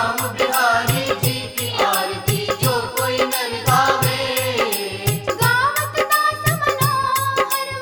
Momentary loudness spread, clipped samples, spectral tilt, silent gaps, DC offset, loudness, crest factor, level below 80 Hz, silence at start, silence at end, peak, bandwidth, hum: 5 LU; under 0.1%; -3.5 dB/octave; none; under 0.1%; -18 LUFS; 16 dB; -46 dBFS; 0 s; 0 s; -4 dBFS; over 20 kHz; none